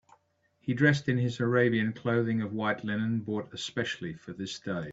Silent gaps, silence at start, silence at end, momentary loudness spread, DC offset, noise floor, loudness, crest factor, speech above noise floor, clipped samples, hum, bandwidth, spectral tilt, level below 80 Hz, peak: none; 0.65 s; 0 s; 12 LU; under 0.1%; -70 dBFS; -30 LUFS; 22 dB; 41 dB; under 0.1%; none; 8 kHz; -6.5 dB/octave; -66 dBFS; -8 dBFS